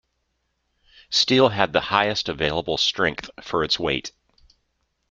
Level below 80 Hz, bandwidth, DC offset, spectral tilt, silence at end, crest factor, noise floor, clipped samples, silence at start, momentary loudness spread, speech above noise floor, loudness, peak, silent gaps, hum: -52 dBFS; 8.6 kHz; under 0.1%; -3.5 dB/octave; 1 s; 22 dB; -73 dBFS; under 0.1%; 1.1 s; 10 LU; 51 dB; -21 LUFS; -2 dBFS; none; none